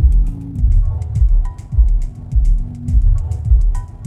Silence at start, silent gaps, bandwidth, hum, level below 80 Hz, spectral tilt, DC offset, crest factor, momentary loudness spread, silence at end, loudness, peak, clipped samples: 0 s; none; 2 kHz; none; -14 dBFS; -9 dB/octave; under 0.1%; 12 dB; 5 LU; 0 s; -18 LUFS; -2 dBFS; under 0.1%